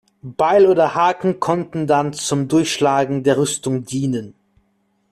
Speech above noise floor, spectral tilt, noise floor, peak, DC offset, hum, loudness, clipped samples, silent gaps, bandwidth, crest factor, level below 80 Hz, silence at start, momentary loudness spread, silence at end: 47 dB; -5 dB/octave; -64 dBFS; -4 dBFS; under 0.1%; none; -18 LUFS; under 0.1%; none; 14 kHz; 14 dB; -58 dBFS; 0.25 s; 9 LU; 0.8 s